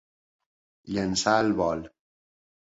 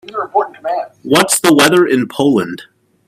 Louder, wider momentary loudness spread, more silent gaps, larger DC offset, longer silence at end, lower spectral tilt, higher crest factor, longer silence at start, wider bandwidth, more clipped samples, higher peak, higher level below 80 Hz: second, -26 LUFS vs -13 LUFS; about the same, 10 LU vs 12 LU; neither; neither; first, 0.9 s vs 0.45 s; about the same, -4 dB/octave vs -3.5 dB/octave; first, 22 dB vs 14 dB; first, 0.85 s vs 0.1 s; second, 8 kHz vs 16.5 kHz; neither; second, -8 dBFS vs 0 dBFS; about the same, -56 dBFS vs -58 dBFS